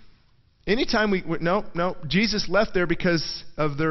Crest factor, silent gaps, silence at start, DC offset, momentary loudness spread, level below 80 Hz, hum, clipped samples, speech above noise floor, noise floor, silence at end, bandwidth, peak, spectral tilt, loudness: 14 dB; none; 0 s; under 0.1%; 6 LU; -40 dBFS; none; under 0.1%; 36 dB; -59 dBFS; 0 s; 6.4 kHz; -8 dBFS; -5.5 dB/octave; -24 LUFS